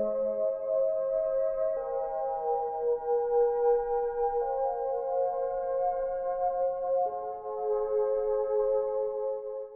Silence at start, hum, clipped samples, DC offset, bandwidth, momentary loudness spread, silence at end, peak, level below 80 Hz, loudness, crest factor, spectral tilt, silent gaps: 0 s; none; under 0.1%; under 0.1%; 2.5 kHz; 5 LU; 0 s; -16 dBFS; -56 dBFS; -30 LUFS; 12 dB; -7 dB/octave; none